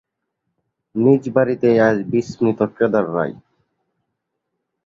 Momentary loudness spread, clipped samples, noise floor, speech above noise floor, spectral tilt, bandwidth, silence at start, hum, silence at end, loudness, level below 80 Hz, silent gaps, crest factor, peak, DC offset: 8 LU; under 0.1%; -77 dBFS; 60 dB; -8 dB/octave; 7.6 kHz; 0.95 s; none; 1.5 s; -18 LUFS; -58 dBFS; none; 18 dB; -2 dBFS; under 0.1%